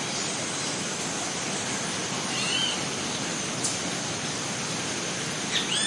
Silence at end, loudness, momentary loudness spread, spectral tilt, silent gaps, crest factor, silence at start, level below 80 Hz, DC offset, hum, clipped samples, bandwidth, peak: 0 s; -27 LUFS; 4 LU; -2 dB/octave; none; 18 dB; 0 s; -64 dBFS; under 0.1%; none; under 0.1%; 11.5 kHz; -12 dBFS